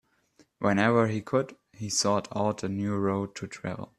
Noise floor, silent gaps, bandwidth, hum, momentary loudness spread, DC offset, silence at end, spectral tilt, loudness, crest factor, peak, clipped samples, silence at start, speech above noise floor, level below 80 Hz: -64 dBFS; none; 13.5 kHz; none; 13 LU; under 0.1%; 0.15 s; -5 dB/octave; -28 LUFS; 20 dB; -8 dBFS; under 0.1%; 0.6 s; 36 dB; -66 dBFS